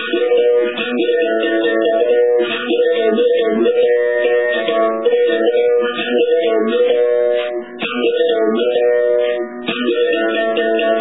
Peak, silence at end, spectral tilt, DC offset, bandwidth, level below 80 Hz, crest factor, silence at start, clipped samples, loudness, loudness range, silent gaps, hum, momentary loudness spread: -2 dBFS; 0 s; -7.5 dB/octave; 0.4%; 4 kHz; -70 dBFS; 12 dB; 0 s; under 0.1%; -15 LUFS; 2 LU; none; none; 4 LU